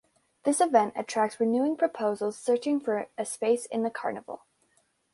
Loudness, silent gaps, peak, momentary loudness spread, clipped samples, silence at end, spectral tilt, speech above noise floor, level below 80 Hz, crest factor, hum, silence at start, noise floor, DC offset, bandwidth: -28 LUFS; none; -8 dBFS; 11 LU; under 0.1%; 0.8 s; -4 dB/octave; 43 dB; -78 dBFS; 20 dB; none; 0.45 s; -70 dBFS; under 0.1%; 11.5 kHz